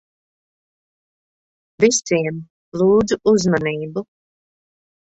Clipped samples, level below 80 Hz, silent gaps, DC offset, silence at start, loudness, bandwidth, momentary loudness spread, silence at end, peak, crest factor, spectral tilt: under 0.1%; -54 dBFS; 2.50-2.72 s; under 0.1%; 1.8 s; -18 LUFS; 8.2 kHz; 14 LU; 1 s; -2 dBFS; 20 dB; -4.5 dB/octave